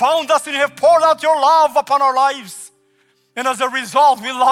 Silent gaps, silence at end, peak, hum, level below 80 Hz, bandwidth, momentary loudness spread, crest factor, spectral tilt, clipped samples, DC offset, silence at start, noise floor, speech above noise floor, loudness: none; 0 s; -4 dBFS; none; -70 dBFS; 16 kHz; 12 LU; 12 dB; -1.5 dB/octave; under 0.1%; under 0.1%; 0 s; -59 dBFS; 45 dB; -14 LUFS